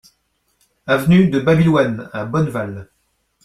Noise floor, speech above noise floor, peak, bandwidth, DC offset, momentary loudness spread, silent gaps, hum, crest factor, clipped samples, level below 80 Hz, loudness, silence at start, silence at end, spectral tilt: -66 dBFS; 50 dB; -2 dBFS; 14 kHz; under 0.1%; 15 LU; none; none; 16 dB; under 0.1%; -46 dBFS; -16 LUFS; 0.85 s; 0.6 s; -7.5 dB/octave